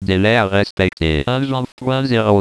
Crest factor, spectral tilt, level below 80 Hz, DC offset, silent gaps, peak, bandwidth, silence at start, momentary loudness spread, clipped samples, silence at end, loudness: 16 dB; -7 dB/octave; -34 dBFS; under 0.1%; 0.71-0.77 s, 1.72-1.77 s; 0 dBFS; 11 kHz; 0 s; 7 LU; under 0.1%; 0 s; -17 LUFS